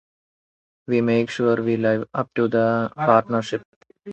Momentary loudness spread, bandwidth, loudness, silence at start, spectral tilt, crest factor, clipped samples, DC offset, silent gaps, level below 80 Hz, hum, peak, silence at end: 7 LU; 8.2 kHz; -21 LUFS; 0.9 s; -7 dB/octave; 20 dB; under 0.1%; under 0.1%; 3.65-3.81 s; -64 dBFS; none; -2 dBFS; 0 s